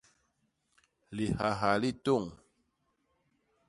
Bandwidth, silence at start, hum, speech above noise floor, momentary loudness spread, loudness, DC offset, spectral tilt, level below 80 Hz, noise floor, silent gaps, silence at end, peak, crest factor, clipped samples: 11.5 kHz; 1.1 s; none; 47 dB; 12 LU; -31 LUFS; under 0.1%; -6 dB/octave; -60 dBFS; -77 dBFS; none; 1.35 s; -12 dBFS; 24 dB; under 0.1%